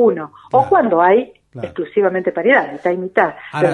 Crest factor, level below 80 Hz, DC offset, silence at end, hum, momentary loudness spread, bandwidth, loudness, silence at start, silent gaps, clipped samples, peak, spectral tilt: 16 dB; -58 dBFS; under 0.1%; 0 s; none; 13 LU; 10.5 kHz; -16 LUFS; 0 s; none; under 0.1%; 0 dBFS; -7.5 dB/octave